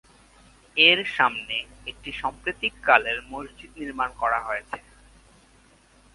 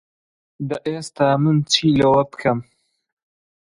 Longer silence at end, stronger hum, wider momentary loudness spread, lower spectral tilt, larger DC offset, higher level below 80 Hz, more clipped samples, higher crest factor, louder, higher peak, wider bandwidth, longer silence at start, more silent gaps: first, 1.35 s vs 1 s; neither; first, 21 LU vs 12 LU; second, -3 dB/octave vs -5.5 dB/octave; neither; about the same, -54 dBFS vs -52 dBFS; neither; first, 26 dB vs 20 dB; second, -23 LUFS vs -19 LUFS; about the same, 0 dBFS vs 0 dBFS; about the same, 11.5 kHz vs 11.5 kHz; first, 0.75 s vs 0.6 s; neither